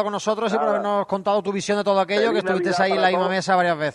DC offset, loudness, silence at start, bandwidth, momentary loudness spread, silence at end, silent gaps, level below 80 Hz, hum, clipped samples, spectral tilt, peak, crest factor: under 0.1%; -21 LUFS; 0 s; 11.5 kHz; 4 LU; 0 s; none; -66 dBFS; none; under 0.1%; -4.5 dB/octave; -6 dBFS; 16 dB